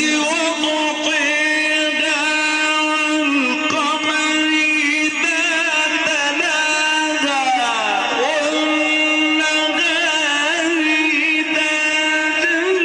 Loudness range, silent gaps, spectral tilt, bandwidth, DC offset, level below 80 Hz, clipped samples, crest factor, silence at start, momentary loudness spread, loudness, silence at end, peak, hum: 1 LU; none; -0.5 dB/octave; 10 kHz; under 0.1%; -66 dBFS; under 0.1%; 12 dB; 0 s; 3 LU; -16 LUFS; 0 s; -6 dBFS; none